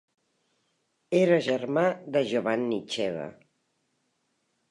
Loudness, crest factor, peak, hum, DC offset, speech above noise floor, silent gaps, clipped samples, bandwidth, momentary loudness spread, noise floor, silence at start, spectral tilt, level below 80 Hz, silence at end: -27 LUFS; 18 dB; -10 dBFS; none; under 0.1%; 49 dB; none; under 0.1%; 11 kHz; 9 LU; -75 dBFS; 1.1 s; -6 dB/octave; -76 dBFS; 1.4 s